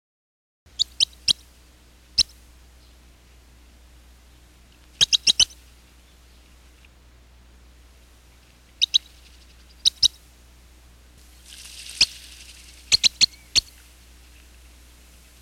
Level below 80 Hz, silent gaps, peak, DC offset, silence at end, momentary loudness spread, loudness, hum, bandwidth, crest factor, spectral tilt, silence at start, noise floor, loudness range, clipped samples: -50 dBFS; none; -6 dBFS; under 0.1%; 1.8 s; 24 LU; -20 LUFS; none; 17 kHz; 22 dB; 1.5 dB/octave; 0.8 s; -52 dBFS; 6 LU; under 0.1%